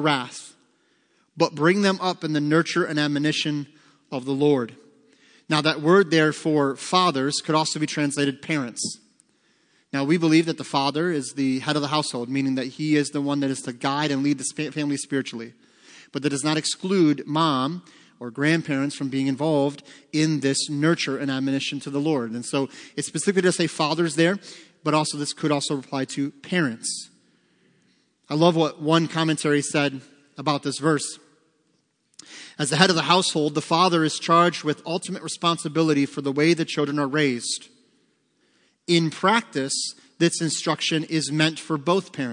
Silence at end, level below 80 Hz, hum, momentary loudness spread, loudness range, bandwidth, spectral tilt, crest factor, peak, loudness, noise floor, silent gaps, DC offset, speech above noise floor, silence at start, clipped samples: 0 s; -76 dBFS; none; 10 LU; 4 LU; 10.5 kHz; -4.5 dB/octave; 24 dB; 0 dBFS; -23 LUFS; -69 dBFS; none; under 0.1%; 46 dB; 0 s; under 0.1%